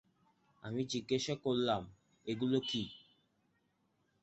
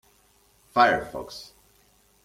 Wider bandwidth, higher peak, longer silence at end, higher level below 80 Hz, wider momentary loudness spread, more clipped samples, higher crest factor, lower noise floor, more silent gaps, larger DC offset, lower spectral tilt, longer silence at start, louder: second, 8 kHz vs 16 kHz; second, -20 dBFS vs -4 dBFS; first, 1.25 s vs 0.8 s; second, -70 dBFS vs -58 dBFS; second, 16 LU vs 20 LU; neither; about the same, 20 dB vs 24 dB; first, -78 dBFS vs -62 dBFS; neither; neither; about the same, -4.5 dB/octave vs -4 dB/octave; about the same, 0.65 s vs 0.75 s; second, -37 LUFS vs -24 LUFS